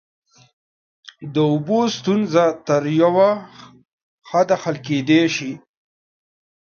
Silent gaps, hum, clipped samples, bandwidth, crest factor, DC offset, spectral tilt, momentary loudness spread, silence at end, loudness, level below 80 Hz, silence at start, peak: 3.93-4.18 s; none; under 0.1%; 7 kHz; 18 dB; under 0.1%; -6 dB/octave; 10 LU; 1.1 s; -18 LUFS; -68 dBFS; 1.2 s; -2 dBFS